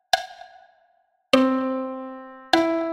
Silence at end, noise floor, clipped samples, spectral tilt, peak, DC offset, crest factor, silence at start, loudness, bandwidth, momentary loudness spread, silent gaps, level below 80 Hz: 0 s; -65 dBFS; under 0.1%; -3 dB/octave; -2 dBFS; under 0.1%; 22 dB; 0.15 s; -22 LUFS; 16 kHz; 18 LU; none; -60 dBFS